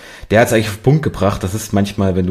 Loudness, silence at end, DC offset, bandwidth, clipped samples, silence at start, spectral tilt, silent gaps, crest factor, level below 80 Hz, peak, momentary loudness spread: -16 LUFS; 0 s; under 0.1%; 15.5 kHz; under 0.1%; 0 s; -6 dB/octave; none; 14 dB; -38 dBFS; 0 dBFS; 6 LU